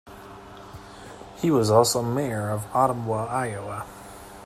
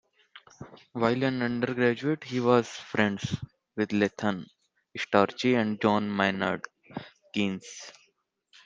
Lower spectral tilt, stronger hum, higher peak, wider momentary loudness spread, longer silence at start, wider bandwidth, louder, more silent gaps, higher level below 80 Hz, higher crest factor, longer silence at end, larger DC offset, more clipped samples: about the same, -5 dB/octave vs -6 dB/octave; neither; about the same, -6 dBFS vs -6 dBFS; first, 24 LU vs 18 LU; second, 0.05 s vs 0.35 s; first, 15.5 kHz vs 7.8 kHz; first, -24 LUFS vs -28 LUFS; neither; first, -54 dBFS vs -66 dBFS; about the same, 20 dB vs 24 dB; second, 0 s vs 0.75 s; neither; neither